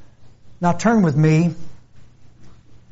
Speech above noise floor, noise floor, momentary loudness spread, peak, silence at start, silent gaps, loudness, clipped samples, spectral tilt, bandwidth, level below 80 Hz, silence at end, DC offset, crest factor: 25 dB; -41 dBFS; 8 LU; -6 dBFS; 0 s; none; -17 LUFS; under 0.1%; -8 dB/octave; 8 kHz; -50 dBFS; 0.15 s; under 0.1%; 14 dB